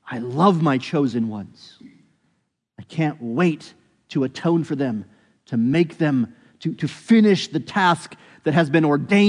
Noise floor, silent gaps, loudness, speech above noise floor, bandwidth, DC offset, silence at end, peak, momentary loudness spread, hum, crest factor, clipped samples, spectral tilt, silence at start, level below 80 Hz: -71 dBFS; none; -21 LUFS; 51 dB; 10.5 kHz; under 0.1%; 0 s; -2 dBFS; 13 LU; none; 18 dB; under 0.1%; -7 dB/octave; 0.05 s; -68 dBFS